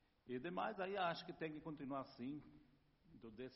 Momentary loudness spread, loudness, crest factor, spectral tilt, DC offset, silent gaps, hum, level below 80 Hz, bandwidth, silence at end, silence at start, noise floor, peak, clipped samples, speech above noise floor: 14 LU; -47 LUFS; 20 dB; -4 dB/octave; under 0.1%; none; none; -78 dBFS; 5.8 kHz; 0 s; 0.25 s; -73 dBFS; -30 dBFS; under 0.1%; 25 dB